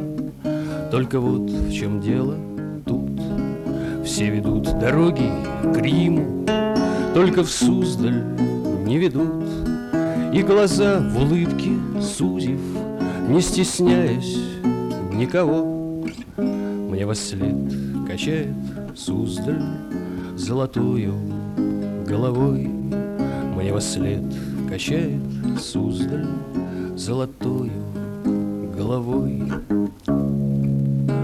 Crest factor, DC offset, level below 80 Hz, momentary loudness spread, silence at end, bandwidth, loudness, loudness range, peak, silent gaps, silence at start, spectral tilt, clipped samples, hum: 14 dB; under 0.1%; -40 dBFS; 9 LU; 0 s; 14 kHz; -22 LUFS; 5 LU; -6 dBFS; none; 0 s; -6.5 dB/octave; under 0.1%; none